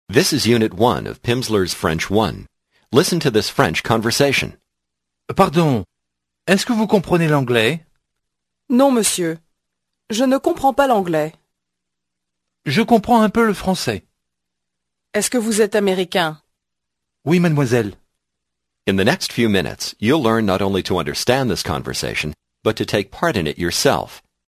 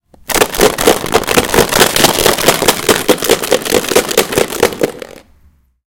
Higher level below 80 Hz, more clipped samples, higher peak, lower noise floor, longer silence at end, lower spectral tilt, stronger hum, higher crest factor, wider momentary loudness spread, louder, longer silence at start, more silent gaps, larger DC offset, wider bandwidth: second, -44 dBFS vs -34 dBFS; second, under 0.1% vs 1%; about the same, 0 dBFS vs 0 dBFS; first, -81 dBFS vs -49 dBFS; second, 0.3 s vs 0.7 s; first, -4.5 dB/octave vs -2.5 dB/octave; first, 60 Hz at -45 dBFS vs none; first, 18 dB vs 12 dB; first, 9 LU vs 6 LU; second, -18 LUFS vs -11 LUFS; second, 0.1 s vs 0.3 s; neither; neither; second, 15 kHz vs over 20 kHz